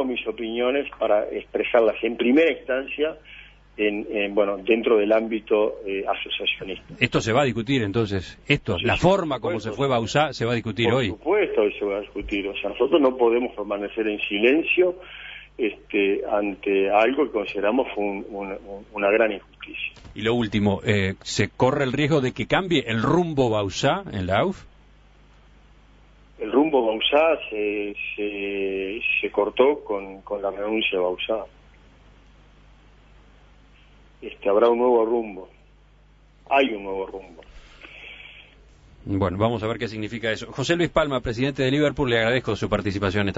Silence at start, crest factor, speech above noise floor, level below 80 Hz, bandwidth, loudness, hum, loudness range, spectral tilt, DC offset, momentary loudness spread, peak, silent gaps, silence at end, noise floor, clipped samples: 0 s; 22 dB; 31 dB; -48 dBFS; 8 kHz; -23 LUFS; 50 Hz at -50 dBFS; 6 LU; -6 dB/octave; under 0.1%; 12 LU; -2 dBFS; none; 0 s; -54 dBFS; under 0.1%